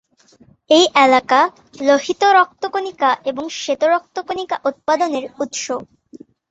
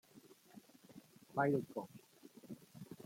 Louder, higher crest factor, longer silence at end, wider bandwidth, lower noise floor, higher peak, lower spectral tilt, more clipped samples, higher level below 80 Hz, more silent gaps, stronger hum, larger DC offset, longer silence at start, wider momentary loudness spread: first, -17 LUFS vs -40 LUFS; second, 16 dB vs 22 dB; first, 0.35 s vs 0.05 s; second, 8.2 kHz vs 16.5 kHz; second, -51 dBFS vs -64 dBFS; first, 0 dBFS vs -22 dBFS; second, -2 dB/octave vs -7.5 dB/octave; neither; first, -64 dBFS vs -84 dBFS; neither; neither; neither; first, 0.7 s vs 0.15 s; second, 12 LU vs 25 LU